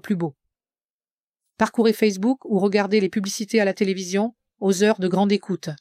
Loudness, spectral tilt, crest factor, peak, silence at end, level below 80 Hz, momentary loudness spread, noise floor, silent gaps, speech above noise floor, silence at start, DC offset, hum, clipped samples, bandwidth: -22 LUFS; -5.5 dB/octave; 18 dB; -6 dBFS; 0.05 s; -68 dBFS; 7 LU; under -90 dBFS; 0.90-1.00 s, 1.11-1.27 s; over 69 dB; 0.05 s; under 0.1%; none; under 0.1%; 15 kHz